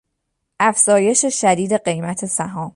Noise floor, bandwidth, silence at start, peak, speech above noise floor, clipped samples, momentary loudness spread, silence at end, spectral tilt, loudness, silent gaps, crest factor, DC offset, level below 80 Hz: -74 dBFS; 11.5 kHz; 0.6 s; -2 dBFS; 57 dB; under 0.1%; 9 LU; 0.05 s; -3.5 dB/octave; -16 LUFS; none; 16 dB; under 0.1%; -62 dBFS